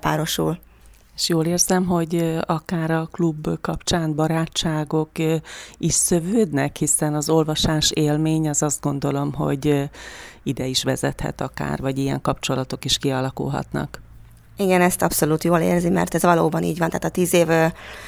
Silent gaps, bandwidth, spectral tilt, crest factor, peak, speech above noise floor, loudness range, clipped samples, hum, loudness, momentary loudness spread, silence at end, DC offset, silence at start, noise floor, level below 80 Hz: none; over 20 kHz; -4.5 dB/octave; 18 dB; -2 dBFS; 28 dB; 5 LU; under 0.1%; none; -21 LUFS; 9 LU; 0 s; under 0.1%; 0.05 s; -49 dBFS; -44 dBFS